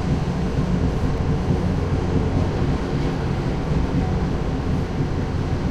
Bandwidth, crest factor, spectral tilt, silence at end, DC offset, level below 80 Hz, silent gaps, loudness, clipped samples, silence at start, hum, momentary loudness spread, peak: 9.8 kHz; 14 dB; -8 dB/octave; 0 s; under 0.1%; -28 dBFS; none; -23 LUFS; under 0.1%; 0 s; none; 2 LU; -6 dBFS